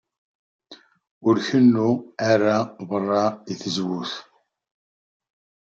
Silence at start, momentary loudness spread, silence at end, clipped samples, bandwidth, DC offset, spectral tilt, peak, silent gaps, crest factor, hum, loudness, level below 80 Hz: 0.7 s; 12 LU; 1.55 s; under 0.1%; 7.6 kHz; under 0.1%; -6 dB/octave; -4 dBFS; 1.11-1.21 s; 18 dB; none; -22 LUFS; -70 dBFS